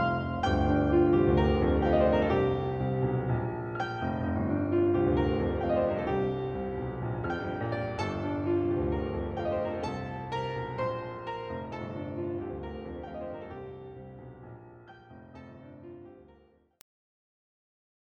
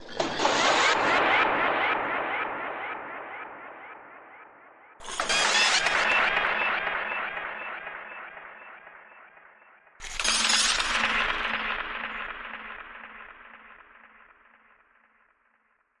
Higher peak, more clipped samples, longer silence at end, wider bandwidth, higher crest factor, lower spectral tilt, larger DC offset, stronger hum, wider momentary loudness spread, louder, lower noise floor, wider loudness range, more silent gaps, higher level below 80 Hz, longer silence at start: second, -12 dBFS vs -8 dBFS; neither; second, 1.9 s vs 2.25 s; second, 7 kHz vs 11.5 kHz; about the same, 20 dB vs 20 dB; first, -8.5 dB/octave vs -0.5 dB/octave; neither; neither; about the same, 22 LU vs 23 LU; second, -30 LUFS vs -25 LUFS; second, -62 dBFS vs -69 dBFS; first, 18 LU vs 12 LU; neither; first, -42 dBFS vs -54 dBFS; about the same, 0 s vs 0 s